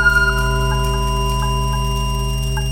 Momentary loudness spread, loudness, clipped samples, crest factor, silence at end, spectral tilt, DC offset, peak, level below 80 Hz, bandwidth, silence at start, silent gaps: 6 LU; -19 LUFS; under 0.1%; 14 dB; 0 s; -4.5 dB/octave; under 0.1%; -2 dBFS; -20 dBFS; 17 kHz; 0 s; none